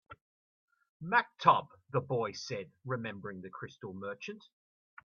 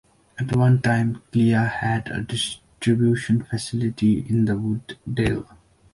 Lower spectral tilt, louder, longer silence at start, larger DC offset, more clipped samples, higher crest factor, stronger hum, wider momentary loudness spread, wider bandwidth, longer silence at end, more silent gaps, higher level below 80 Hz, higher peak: second, -3.5 dB/octave vs -6.5 dB/octave; second, -34 LUFS vs -22 LUFS; second, 0.1 s vs 0.35 s; neither; neither; first, 26 dB vs 14 dB; neither; first, 18 LU vs 9 LU; second, 7 kHz vs 11.5 kHz; first, 0.65 s vs 0.5 s; first, 0.21-0.68 s, 0.89-1.00 s vs none; second, -76 dBFS vs -46 dBFS; about the same, -10 dBFS vs -8 dBFS